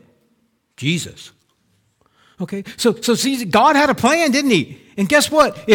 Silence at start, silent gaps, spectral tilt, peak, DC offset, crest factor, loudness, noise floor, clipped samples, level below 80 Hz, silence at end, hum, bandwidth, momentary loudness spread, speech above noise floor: 0.8 s; none; -4 dB/octave; -2 dBFS; under 0.1%; 16 dB; -16 LUFS; -64 dBFS; under 0.1%; -54 dBFS; 0 s; none; 19 kHz; 14 LU; 47 dB